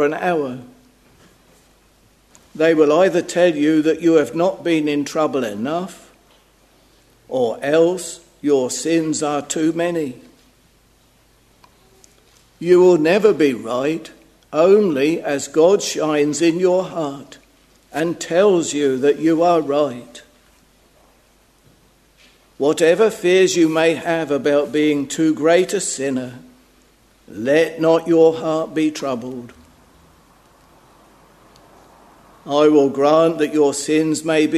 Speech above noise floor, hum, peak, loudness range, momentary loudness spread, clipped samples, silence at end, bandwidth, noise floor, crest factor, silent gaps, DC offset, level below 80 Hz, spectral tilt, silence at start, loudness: 38 dB; none; 0 dBFS; 6 LU; 12 LU; under 0.1%; 0 s; 13.5 kHz; -55 dBFS; 18 dB; none; under 0.1%; -60 dBFS; -4.5 dB/octave; 0 s; -17 LUFS